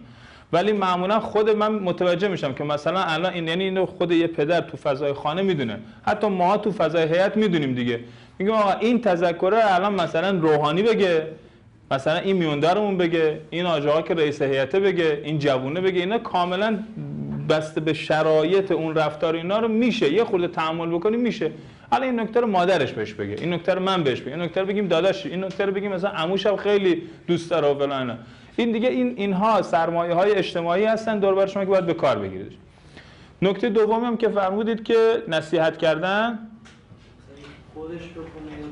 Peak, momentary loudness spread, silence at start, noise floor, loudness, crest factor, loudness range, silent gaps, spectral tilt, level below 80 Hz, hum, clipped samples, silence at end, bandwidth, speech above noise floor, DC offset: -8 dBFS; 8 LU; 0 s; -48 dBFS; -22 LUFS; 14 dB; 2 LU; none; -6.5 dB/octave; -58 dBFS; none; under 0.1%; 0 s; 10.5 kHz; 27 dB; under 0.1%